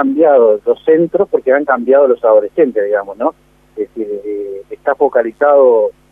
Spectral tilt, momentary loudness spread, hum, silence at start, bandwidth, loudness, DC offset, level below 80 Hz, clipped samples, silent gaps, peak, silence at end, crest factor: -8.5 dB/octave; 13 LU; none; 0 s; 3.7 kHz; -12 LUFS; under 0.1%; -56 dBFS; under 0.1%; none; 0 dBFS; 0.2 s; 12 dB